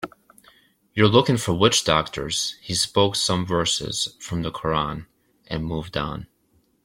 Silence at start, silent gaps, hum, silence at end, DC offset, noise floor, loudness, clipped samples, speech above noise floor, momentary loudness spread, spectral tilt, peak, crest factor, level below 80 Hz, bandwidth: 0 s; none; none; 0.6 s; under 0.1%; -64 dBFS; -22 LUFS; under 0.1%; 42 dB; 13 LU; -4 dB/octave; -2 dBFS; 22 dB; -48 dBFS; 16.5 kHz